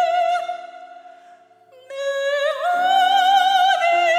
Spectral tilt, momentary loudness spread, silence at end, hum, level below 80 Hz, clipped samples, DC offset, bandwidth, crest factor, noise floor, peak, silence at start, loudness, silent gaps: 0.5 dB/octave; 16 LU; 0 s; none; under -90 dBFS; under 0.1%; under 0.1%; 15.5 kHz; 14 dB; -50 dBFS; -6 dBFS; 0 s; -18 LUFS; none